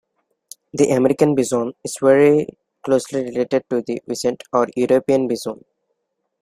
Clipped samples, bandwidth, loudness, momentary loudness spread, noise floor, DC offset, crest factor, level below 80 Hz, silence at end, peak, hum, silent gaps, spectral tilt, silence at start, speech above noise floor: under 0.1%; 15.5 kHz; -18 LUFS; 12 LU; -74 dBFS; under 0.1%; 18 dB; -60 dBFS; 0.9 s; -2 dBFS; none; none; -5.5 dB/octave; 0.75 s; 56 dB